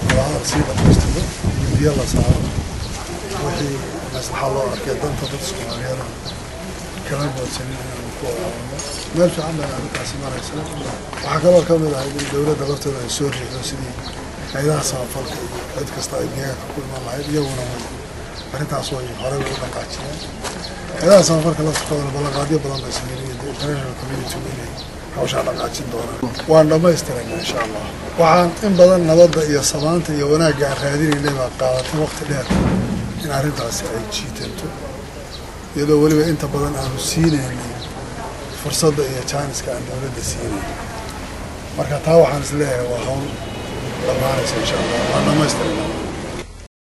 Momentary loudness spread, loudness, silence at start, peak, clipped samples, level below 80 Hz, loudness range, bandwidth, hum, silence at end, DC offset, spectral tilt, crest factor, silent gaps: 15 LU; -19 LUFS; 0 s; 0 dBFS; under 0.1%; -34 dBFS; 10 LU; 13 kHz; none; 0.2 s; under 0.1%; -5 dB/octave; 18 dB; none